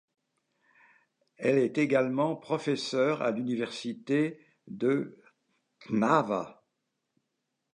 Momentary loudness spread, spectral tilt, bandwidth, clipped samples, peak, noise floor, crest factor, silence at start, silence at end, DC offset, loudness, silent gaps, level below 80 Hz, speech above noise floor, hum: 9 LU; -6 dB/octave; 10.5 kHz; under 0.1%; -8 dBFS; -82 dBFS; 22 dB; 1.4 s; 1.2 s; under 0.1%; -29 LUFS; none; -80 dBFS; 54 dB; none